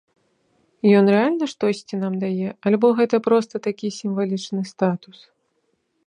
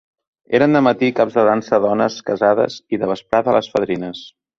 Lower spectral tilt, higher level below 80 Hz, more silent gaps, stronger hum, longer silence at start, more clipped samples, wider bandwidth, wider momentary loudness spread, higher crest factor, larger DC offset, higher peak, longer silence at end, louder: about the same, -7 dB/octave vs -6.5 dB/octave; second, -72 dBFS vs -56 dBFS; neither; neither; first, 0.85 s vs 0.5 s; neither; first, 10 kHz vs 7.4 kHz; about the same, 10 LU vs 8 LU; about the same, 18 dB vs 16 dB; neither; second, -4 dBFS vs 0 dBFS; first, 1.1 s vs 0.3 s; second, -21 LUFS vs -17 LUFS